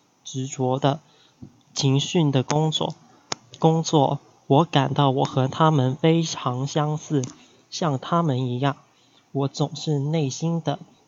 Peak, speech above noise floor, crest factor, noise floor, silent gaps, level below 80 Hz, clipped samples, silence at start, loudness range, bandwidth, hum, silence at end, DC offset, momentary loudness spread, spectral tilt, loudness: -2 dBFS; 26 dB; 20 dB; -48 dBFS; none; -68 dBFS; under 0.1%; 0.25 s; 5 LU; 7.8 kHz; none; 0.3 s; under 0.1%; 12 LU; -6 dB/octave; -23 LUFS